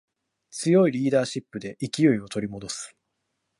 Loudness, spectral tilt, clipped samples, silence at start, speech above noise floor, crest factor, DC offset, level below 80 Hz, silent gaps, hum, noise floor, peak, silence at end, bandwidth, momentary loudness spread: -25 LUFS; -5.5 dB/octave; under 0.1%; 0.55 s; 54 dB; 18 dB; under 0.1%; -64 dBFS; none; none; -78 dBFS; -8 dBFS; 0.7 s; 11.5 kHz; 16 LU